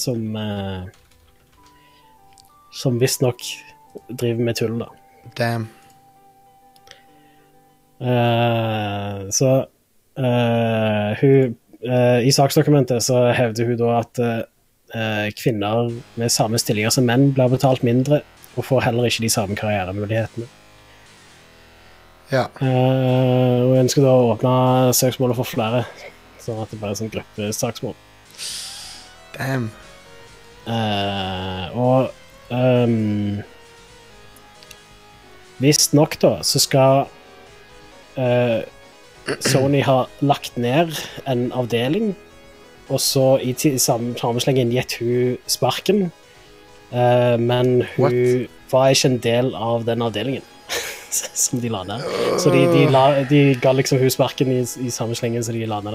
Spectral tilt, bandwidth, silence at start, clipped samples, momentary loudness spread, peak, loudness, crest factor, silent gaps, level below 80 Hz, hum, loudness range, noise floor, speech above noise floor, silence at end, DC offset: -5 dB/octave; 16 kHz; 0 s; under 0.1%; 14 LU; -2 dBFS; -19 LUFS; 18 dB; none; -56 dBFS; none; 9 LU; -54 dBFS; 36 dB; 0 s; under 0.1%